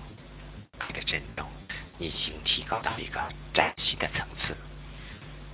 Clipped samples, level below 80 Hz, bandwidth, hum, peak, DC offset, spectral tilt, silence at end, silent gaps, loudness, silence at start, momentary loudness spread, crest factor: under 0.1%; -46 dBFS; 4 kHz; none; -4 dBFS; under 0.1%; -1.5 dB/octave; 0 s; none; -31 LUFS; 0 s; 18 LU; 30 dB